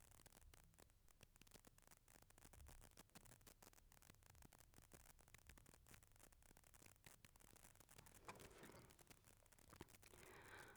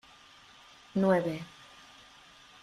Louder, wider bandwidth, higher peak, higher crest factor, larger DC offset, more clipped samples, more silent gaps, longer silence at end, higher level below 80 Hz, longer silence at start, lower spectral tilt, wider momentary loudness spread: second, -67 LUFS vs -30 LUFS; first, over 20 kHz vs 12 kHz; second, -42 dBFS vs -14 dBFS; first, 26 dB vs 20 dB; neither; neither; neither; second, 0 s vs 1.15 s; second, -76 dBFS vs -70 dBFS; second, 0 s vs 0.95 s; second, -3 dB/octave vs -7 dB/octave; second, 6 LU vs 26 LU